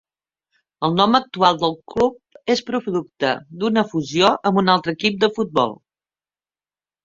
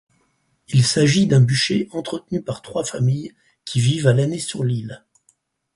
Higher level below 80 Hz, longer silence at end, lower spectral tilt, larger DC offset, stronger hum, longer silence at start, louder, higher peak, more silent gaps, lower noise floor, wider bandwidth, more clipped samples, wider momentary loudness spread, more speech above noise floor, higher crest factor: about the same, -58 dBFS vs -54 dBFS; first, 1.3 s vs 0.8 s; about the same, -5.5 dB/octave vs -5.5 dB/octave; neither; neither; about the same, 0.8 s vs 0.7 s; about the same, -19 LUFS vs -20 LUFS; about the same, 0 dBFS vs -2 dBFS; neither; first, under -90 dBFS vs -66 dBFS; second, 7.6 kHz vs 11.5 kHz; neither; second, 7 LU vs 12 LU; first, over 71 dB vs 47 dB; about the same, 20 dB vs 18 dB